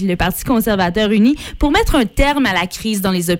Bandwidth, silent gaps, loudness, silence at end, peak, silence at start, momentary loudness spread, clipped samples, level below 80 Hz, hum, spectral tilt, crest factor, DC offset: 17 kHz; none; -15 LUFS; 0 s; -4 dBFS; 0 s; 5 LU; under 0.1%; -26 dBFS; none; -5 dB/octave; 12 dB; under 0.1%